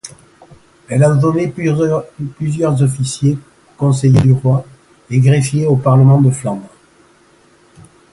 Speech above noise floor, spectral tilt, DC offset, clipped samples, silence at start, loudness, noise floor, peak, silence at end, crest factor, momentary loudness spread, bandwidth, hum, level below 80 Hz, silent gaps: 37 dB; -7.5 dB/octave; under 0.1%; under 0.1%; 0.05 s; -14 LUFS; -49 dBFS; 0 dBFS; 1.45 s; 14 dB; 11 LU; 11.5 kHz; none; -44 dBFS; none